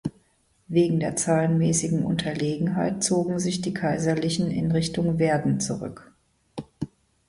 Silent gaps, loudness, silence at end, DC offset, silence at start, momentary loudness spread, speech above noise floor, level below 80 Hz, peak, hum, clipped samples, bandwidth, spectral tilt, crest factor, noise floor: none; -24 LUFS; 0.4 s; under 0.1%; 0.05 s; 15 LU; 41 dB; -54 dBFS; -10 dBFS; none; under 0.1%; 11.5 kHz; -5.5 dB/octave; 16 dB; -65 dBFS